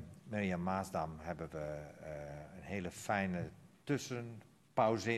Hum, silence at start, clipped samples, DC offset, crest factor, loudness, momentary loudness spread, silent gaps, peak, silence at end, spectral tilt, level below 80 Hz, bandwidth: none; 0 s; under 0.1%; under 0.1%; 22 dB; -40 LUFS; 13 LU; none; -18 dBFS; 0 s; -6 dB/octave; -64 dBFS; 13 kHz